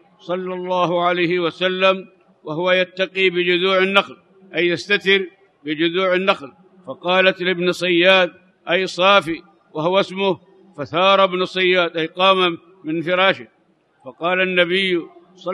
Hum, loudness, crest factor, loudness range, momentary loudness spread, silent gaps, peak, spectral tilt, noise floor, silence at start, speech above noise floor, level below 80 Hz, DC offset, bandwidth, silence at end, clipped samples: none; -18 LUFS; 18 dB; 2 LU; 14 LU; none; 0 dBFS; -5 dB/octave; -59 dBFS; 0.25 s; 41 dB; -68 dBFS; under 0.1%; 11.5 kHz; 0 s; under 0.1%